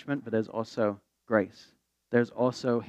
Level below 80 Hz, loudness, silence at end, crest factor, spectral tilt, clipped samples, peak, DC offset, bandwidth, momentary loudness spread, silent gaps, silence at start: -76 dBFS; -30 LUFS; 0 s; 20 dB; -7 dB/octave; under 0.1%; -10 dBFS; under 0.1%; 8.8 kHz; 6 LU; none; 0.05 s